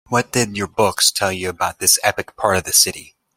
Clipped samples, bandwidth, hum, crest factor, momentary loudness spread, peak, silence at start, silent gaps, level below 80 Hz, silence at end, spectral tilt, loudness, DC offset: under 0.1%; 16.5 kHz; none; 18 dB; 8 LU; 0 dBFS; 0.1 s; none; -52 dBFS; 0.35 s; -2 dB/octave; -16 LUFS; under 0.1%